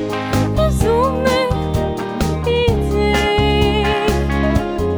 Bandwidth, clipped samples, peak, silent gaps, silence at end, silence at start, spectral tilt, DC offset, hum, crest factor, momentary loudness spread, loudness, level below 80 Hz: over 20 kHz; under 0.1%; -2 dBFS; none; 0 s; 0 s; -6 dB/octave; under 0.1%; none; 14 dB; 5 LU; -17 LUFS; -24 dBFS